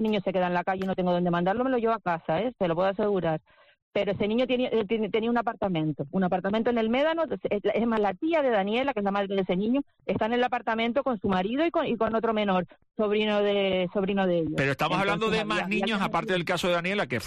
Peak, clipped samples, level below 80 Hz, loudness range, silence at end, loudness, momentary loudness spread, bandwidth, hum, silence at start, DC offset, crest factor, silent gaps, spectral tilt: -16 dBFS; under 0.1%; -56 dBFS; 2 LU; 0 s; -27 LUFS; 4 LU; 11.5 kHz; none; 0 s; under 0.1%; 10 dB; 3.82-3.91 s; -6.5 dB/octave